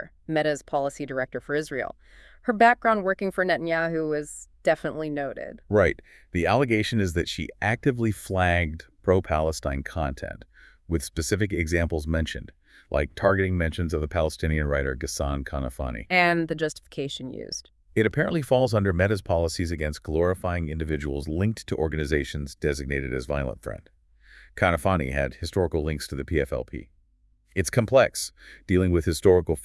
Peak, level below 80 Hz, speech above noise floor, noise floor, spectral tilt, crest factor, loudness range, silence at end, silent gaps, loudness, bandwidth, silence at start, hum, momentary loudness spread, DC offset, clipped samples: -6 dBFS; -40 dBFS; 38 dB; -63 dBFS; -5.5 dB/octave; 20 dB; 4 LU; 0 s; none; -26 LUFS; 12 kHz; 0 s; none; 11 LU; under 0.1%; under 0.1%